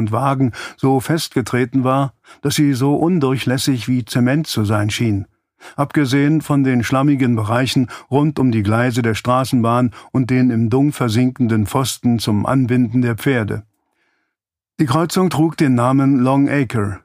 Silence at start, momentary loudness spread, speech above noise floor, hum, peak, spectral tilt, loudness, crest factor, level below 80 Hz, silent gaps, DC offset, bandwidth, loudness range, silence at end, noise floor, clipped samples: 0 s; 5 LU; 65 dB; none; -2 dBFS; -6.5 dB/octave; -17 LUFS; 16 dB; -50 dBFS; none; under 0.1%; 15.5 kHz; 2 LU; 0.05 s; -81 dBFS; under 0.1%